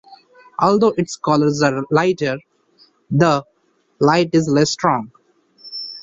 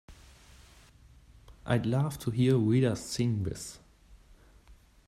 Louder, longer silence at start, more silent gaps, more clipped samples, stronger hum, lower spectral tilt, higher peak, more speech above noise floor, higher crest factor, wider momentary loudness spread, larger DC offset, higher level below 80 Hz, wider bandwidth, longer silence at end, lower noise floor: first, -17 LUFS vs -29 LUFS; about the same, 0.1 s vs 0.1 s; neither; neither; neither; about the same, -5.5 dB/octave vs -6.5 dB/octave; first, -2 dBFS vs -12 dBFS; first, 46 dB vs 30 dB; about the same, 16 dB vs 20 dB; about the same, 14 LU vs 15 LU; neither; about the same, -56 dBFS vs -56 dBFS; second, 7.8 kHz vs 14 kHz; second, 0 s vs 0.35 s; first, -62 dBFS vs -58 dBFS